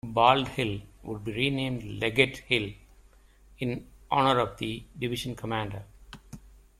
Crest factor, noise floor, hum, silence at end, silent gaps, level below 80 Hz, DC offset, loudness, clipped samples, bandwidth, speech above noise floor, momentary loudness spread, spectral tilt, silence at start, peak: 24 dB; -57 dBFS; none; 0.3 s; none; -52 dBFS; under 0.1%; -28 LUFS; under 0.1%; 15.5 kHz; 29 dB; 16 LU; -5.5 dB/octave; 0.05 s; -4 dBFS